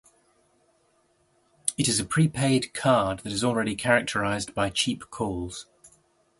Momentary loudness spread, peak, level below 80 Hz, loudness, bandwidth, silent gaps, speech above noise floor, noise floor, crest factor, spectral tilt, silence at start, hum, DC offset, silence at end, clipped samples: 8 LU; -6 dBFS; -54 dBFS; -25 LUFS; 11.5 kHz; none; 41 dB; -67 dBFS; 22 dB; -4 dB/octave; 1.65 s; none; under 0.1%; 0.55 s; under 0.1%